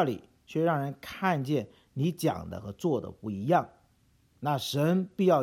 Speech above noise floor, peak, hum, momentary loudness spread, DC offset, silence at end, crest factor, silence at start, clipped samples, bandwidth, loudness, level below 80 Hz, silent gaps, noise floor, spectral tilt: 37 dB; -12 dBFS; none; 11 LU; under 0.1%; 0 s; 18 dB; 0 s; under 0.1%; 17.5 kHz; -30 LUFS; -64 dBFS; none; -66 dBFS; -6.5 dB/octave